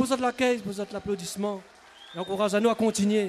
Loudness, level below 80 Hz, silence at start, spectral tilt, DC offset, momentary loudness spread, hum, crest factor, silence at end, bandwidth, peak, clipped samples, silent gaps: -27 LUFS; -62 dBFS; 0 s; -4.5 dB/octave; under 0.1%; 11 LU; none; 16 dB; 0 s; 14 kHz; -12 dBFS; under 0.1%; none